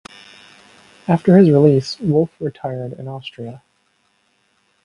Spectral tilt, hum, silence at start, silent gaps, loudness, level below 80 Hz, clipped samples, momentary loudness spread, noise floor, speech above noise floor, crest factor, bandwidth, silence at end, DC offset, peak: -8.5 dB/octave; none; 1.1 s; none; -15 LUFS; -58 dBFS; under 0.1%; 20 LU; -63 dBFS; 47 dB; 18 dB; 11 kHz; 1.3 s; under 0.1%; 0 dBFS